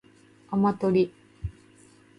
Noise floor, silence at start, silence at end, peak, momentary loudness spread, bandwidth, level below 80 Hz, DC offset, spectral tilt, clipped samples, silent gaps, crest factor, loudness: -56 dBFS; 0.5 s; 0.7 s; -12 dBFS; 16 LU; 10.5 kHz; -50 dBFS; under 0.1%; -9 dB/octave; under 0.1%; none; 18 dB; -25 LUFS